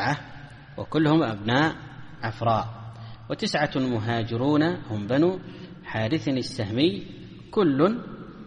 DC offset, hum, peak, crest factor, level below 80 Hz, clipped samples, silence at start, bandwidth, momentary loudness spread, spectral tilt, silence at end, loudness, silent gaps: under 0.1%; none; -6 dBFS; 20 dB; -54 dBFS; under 0.1%; 0 s; 10 kHz; 19 LU; -6.5 dB/octave; 0 s; -25 LUFS; none